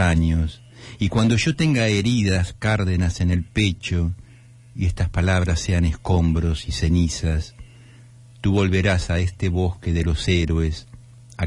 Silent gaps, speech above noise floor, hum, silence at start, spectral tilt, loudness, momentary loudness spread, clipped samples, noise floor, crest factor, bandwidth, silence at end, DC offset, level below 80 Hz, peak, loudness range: none; 27 dB; none; 0 s; -6 dB/octave; -21 LUFS; 8 LU; under 0.1%; -47 dBFS; 14 dB; 11 kHz; 0 s; under 0.1%; -34 dBFS; -6 dBFS; 2 LU